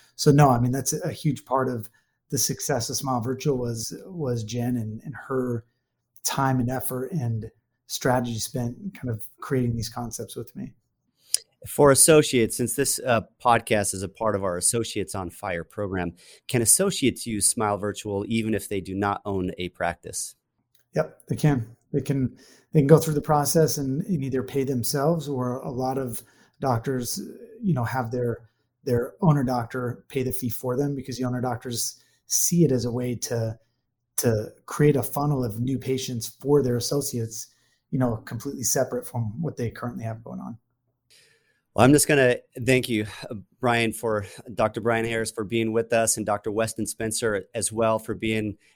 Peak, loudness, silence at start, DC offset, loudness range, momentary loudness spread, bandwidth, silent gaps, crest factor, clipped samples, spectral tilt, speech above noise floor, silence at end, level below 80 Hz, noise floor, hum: 0 dBFS; -25 LUFS; 0.2 s; under 0.1%; 7 LU; 13 LU; over 20 kHz; none; 26 dB; under 0.1%; -4.5 dB/octave; 51 dB; 0.2 s; -52 dBFS; -76 dBFS; none